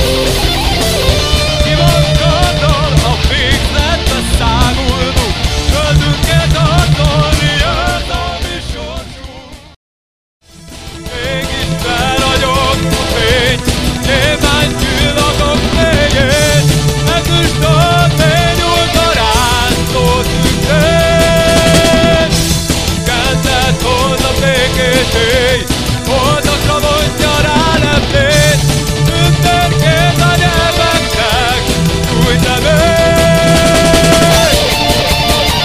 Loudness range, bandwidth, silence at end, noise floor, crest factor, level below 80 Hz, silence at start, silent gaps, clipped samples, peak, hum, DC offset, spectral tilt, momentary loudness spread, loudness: 5 LU; 16.5 kHz; 0 s; -31 dBFS; 10 dB; -18 dBFS; 0 s; 9.76-10.40 s; under 0.1%; 0 dBFS; none; 3%; -4 dB/octave; 5 LU; -10 LUFS